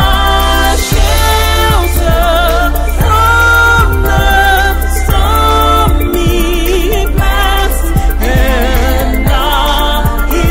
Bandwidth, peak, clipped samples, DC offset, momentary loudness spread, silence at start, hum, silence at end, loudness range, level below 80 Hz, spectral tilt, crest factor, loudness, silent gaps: 16.5 kHz; 0 dBFS; under 0.1%; under 0.1%; 5 LU; 0 s; none; 0 s; 3 LU; -12 dBFS; -4.5 dB/octave; 8 dB; -10 LUFS; none